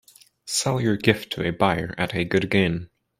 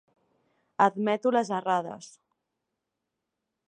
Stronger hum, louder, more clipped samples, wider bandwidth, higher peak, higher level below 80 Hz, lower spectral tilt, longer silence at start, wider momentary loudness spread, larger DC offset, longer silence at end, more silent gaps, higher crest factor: neither; first, -23 LUFS vs -26 LUFS; neither; first, 16 kHz vs 10.5 kHz; first, -2 dBFS vs -8 dBFS; first, -52 dBFS vs -84 dBFS; about the same, -4.5 dB/octave vs -5.5 dB/octave; second, 0.45 s vs 0.8 s; second, 6 LU vs 17 LU; neither; second, 0.35 s vs 1.65 s; neither; about the same, 22 dB vs 22 dB